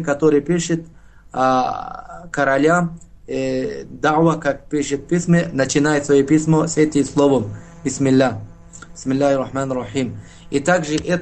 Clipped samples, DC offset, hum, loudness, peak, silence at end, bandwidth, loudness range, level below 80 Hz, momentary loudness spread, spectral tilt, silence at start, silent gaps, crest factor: under 0.1%; 0.4%; none; -18 LUFS; 0 dBFS; 0 s; 9 kHz; 3 LU; -46 dBFS; 13 LU; -5.5 dB/octave; 0 s; none; 18 dB